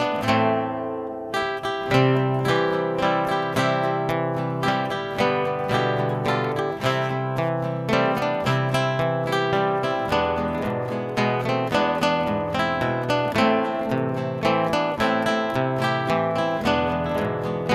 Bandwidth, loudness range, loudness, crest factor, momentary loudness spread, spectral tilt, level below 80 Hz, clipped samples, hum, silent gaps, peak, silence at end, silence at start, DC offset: 16 kHz; 1 LU; -23 LUFS; 20 dB; 5 LU; -6 dB/octave; -48 dBFS; under 0.1%; none; none; -4 dBFS; 0 s; 0 s; under 0.1%